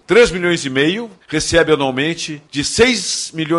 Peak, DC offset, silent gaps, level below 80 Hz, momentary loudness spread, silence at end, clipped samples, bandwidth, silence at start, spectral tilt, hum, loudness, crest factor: -2 dBFS; under 0.1%; none; -40 dBFS; 10 LU; 0 s; under 0.1%; 11.5 kHz; 0.1 s; -3.5 dB/octave; none; -16 LUFS; 14 dB